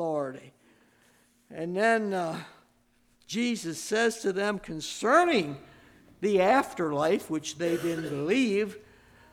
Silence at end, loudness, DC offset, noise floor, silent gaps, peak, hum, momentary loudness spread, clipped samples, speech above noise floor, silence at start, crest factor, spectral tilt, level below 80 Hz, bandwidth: 0.5 s; -28 LUFS; under 0.1%; -66 dBFS; none; -10 dBFS; none; 13 LU; under 0.1%; 39 dB; 0 s; 20 dB; -4.5 dB/octave; -66 dBFS; 17 kHz